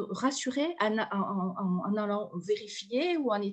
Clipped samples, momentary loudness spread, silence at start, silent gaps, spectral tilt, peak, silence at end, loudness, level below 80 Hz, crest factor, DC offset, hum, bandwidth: under 0.1%; 5 LU; 0 s; none; -5 dB/octave; -12 dBFS; 0 s; -31 LUFS; -80 dBFS; 18 dB; under 0.1%; none; 9.2 kHz